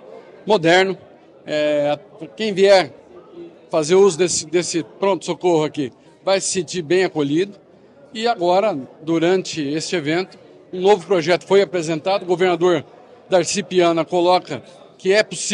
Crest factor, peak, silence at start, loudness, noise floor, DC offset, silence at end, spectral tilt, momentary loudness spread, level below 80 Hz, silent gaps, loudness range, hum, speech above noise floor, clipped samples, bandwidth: 16 dB; -4 dBFS; 0.05 s; -18 LUFS; -47 dBFS; under 0.1%; 0 s; -4 dB/octave; 13 LU; -66 dBFS; none; 3 LU; none; 30 dB; under 0.1%; 10.5 kHz